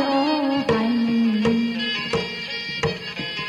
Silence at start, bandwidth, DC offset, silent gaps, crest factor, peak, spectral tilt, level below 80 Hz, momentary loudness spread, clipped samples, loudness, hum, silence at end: 0 s; 9.8 kHz; under 0.1%; none; 14 dB; -8 dBFS; -5.5 dB/octave; -52 dBFS; 7 LU; under 0.1%; -22 LUFS; none; 0 s